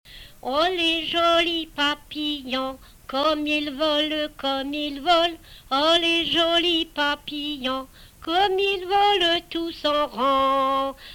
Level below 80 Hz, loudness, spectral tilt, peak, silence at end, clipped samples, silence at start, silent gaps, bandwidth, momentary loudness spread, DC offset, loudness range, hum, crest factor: -50 dBFS; -22 LUFS; -3 dB/octave; -8 dBFS; 0 s; under 0.1%; 0.1 s; none; 19 kHz; 9 LU; under 0.1%; 3 LU; none; 16 dB